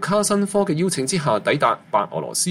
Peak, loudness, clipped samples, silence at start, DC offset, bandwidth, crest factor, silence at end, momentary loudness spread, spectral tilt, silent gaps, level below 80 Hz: -4 dBFS; -20 LUFS; under 0.1%; 0 s; under 0.1%; 16 kHz; 16 dB; 0 s; 4 LU; -4 dB/octave; none; -60 dBFS